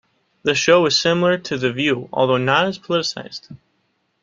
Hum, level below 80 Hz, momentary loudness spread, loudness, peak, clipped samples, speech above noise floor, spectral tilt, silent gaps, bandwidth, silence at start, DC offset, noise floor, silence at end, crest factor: none; -60 dBFS; 11 LU; -18 LUFS; -2 dBFS; under 0.1%; 49 dB; -4 dB/octave; none; 7.6 kHz; 0.45 s; under 0.1%; -67 dBFS; 0.65 s; 18 dB